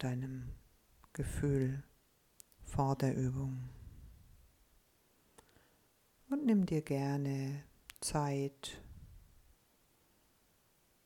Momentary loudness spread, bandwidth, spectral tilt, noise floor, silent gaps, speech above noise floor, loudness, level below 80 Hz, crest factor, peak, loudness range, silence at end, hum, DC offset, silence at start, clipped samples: 23 LU; 17.5 kHz; -6.5 dB/octave; -72 dBFS; none; 36 dB; -37 LUFS; -56 dBFS; 18 dB; -20 dBFS; 6 LU; 1.85 s; none; under 0.1%; 0 s; under 0.1%